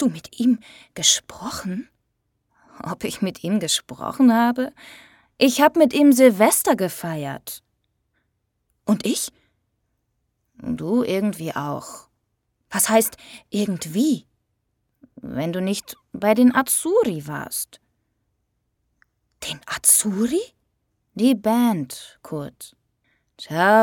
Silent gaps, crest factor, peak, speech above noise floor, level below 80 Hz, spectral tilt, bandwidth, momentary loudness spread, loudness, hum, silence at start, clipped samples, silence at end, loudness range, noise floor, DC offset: none; 22 dB; 0 dBFS; 53 dB; -60 dBFS; -3.5 dB/octave; 18 kHz; 18 LU; -20 LUFS; none; 0 s; under 0.1%; 0 s; 9 LU; -73 dBFS; under 0.1%